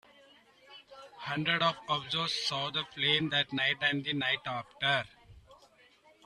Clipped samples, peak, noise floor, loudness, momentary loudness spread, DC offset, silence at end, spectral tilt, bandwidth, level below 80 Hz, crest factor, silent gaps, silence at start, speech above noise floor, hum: under 0.1%; -14 dBFS; -63 dBFS; -30 LUFS; 14 LU; under 0.1%; 0.7 s; -4 dB/octave; 13 kHz; -68 dBFS; 20 dB; none; 0.7 s; 31 dB; none